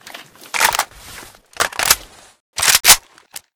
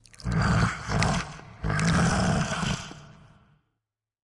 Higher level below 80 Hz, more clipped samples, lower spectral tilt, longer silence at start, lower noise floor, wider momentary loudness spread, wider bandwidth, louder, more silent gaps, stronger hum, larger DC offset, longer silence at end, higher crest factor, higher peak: about the same, -44 dBFS vs -40 dBFS; first, 0.3% vs under 0.1%; second, 1.5 dB/octave vs -5 dB/octave; second, 0.05 s vs 0.2 s; second, -40 dBFS vs -85 dBFS; first, 19 LU vs 13 LU; first, over 20 kHz vs 11.5 kHz; first, -14 LUFS vs -26 LUFS; first, 2.40-2.53 s vs none; neither; neither; second, 0.2 s vs 1.3 s; about the same, 18 dB vs 20 dB; first, 0 dBFS vs -8 dBFS